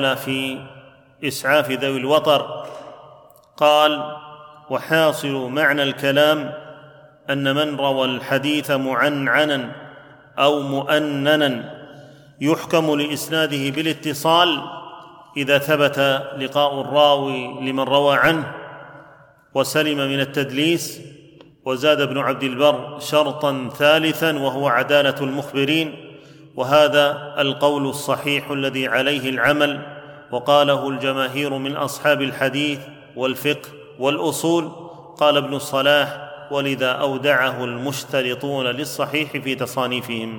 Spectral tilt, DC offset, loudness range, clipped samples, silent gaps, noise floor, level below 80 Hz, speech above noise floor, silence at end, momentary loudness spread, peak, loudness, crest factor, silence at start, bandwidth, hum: -4.5 dB/octave; under 0.1%; 3 LU; under 0.1%; none; -49 dBFS; -64 dBFS; 30 dB; 0 s; 14 LU; -2 dBFS; -19 LUFS; 18 dB; 0 s; 19 kHz; none